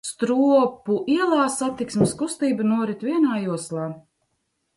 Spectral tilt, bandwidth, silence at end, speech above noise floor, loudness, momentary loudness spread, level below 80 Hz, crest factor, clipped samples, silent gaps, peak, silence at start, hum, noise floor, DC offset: -5.5 dB/octave; 11.5 kHz; 0.75 s; 52 dB; -22 LUFS; 10 LU; -62 dBFS; 16 dB; under 0.1%; none; -6 dBFS; 0.05 s; none; -74 dBFS; under 0.1%